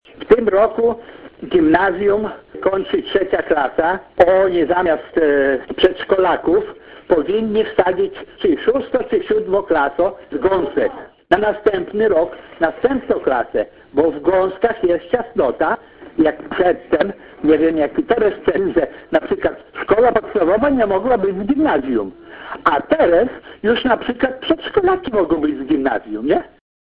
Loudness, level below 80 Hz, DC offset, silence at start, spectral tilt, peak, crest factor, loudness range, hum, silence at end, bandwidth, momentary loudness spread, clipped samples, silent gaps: -17 LUFS; -44 dBFS; under 0.1%; 0.2 s; -8 dB/octave; 0 dBFS; 16 dB; 2 LU; none; 0.35 s; 5 kHz; 7 LU; under 0.1%; none